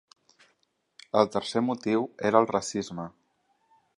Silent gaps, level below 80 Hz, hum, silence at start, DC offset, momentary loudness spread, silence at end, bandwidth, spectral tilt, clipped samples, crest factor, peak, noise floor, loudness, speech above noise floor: none; -68 dBFS; none; 1.15 s; under 0.1%; 13 LU; 0.9 s; 11.5 kHz; -5 dB/octave; under 0.1%; 24 dB; -4 dBFS; -73 dBFS; -27 LUFS; 46 dB